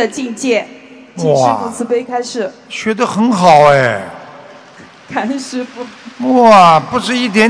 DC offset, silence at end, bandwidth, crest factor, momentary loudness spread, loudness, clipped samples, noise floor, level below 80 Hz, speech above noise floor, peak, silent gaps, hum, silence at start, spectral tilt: under 0.1%; 0 s; 11 kHz; 12 dB; 19 LU; -12 LUFS; 2%; -38 dBFS; -54 dBFS; 26 dB; 0 dBFS; none; none; 0 s; -5 dB/octave